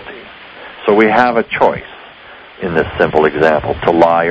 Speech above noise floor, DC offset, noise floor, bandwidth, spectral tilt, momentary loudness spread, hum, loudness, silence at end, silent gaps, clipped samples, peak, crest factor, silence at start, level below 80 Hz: 25 dB; under 0.1%; -37 dBFS; 8 kHz; -7 dB/octave; 22 LU; none; -13 LUFS; 0 s; none; 0.4%; 0 dBFS; 14 dB; 0 s; -40 dBFS